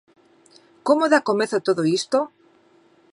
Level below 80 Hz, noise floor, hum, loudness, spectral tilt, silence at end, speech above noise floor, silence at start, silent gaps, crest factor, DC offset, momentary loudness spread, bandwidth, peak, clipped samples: -78 dBFS; -57 dBFS; none; -21 LUFS; -4.5 dB/octave; 0.85 s; 37 dB; 0.85 s; none; 20 dB; under 0.1%; 9 LU; 11.5 kHz; -2 dBFS; under 0.1%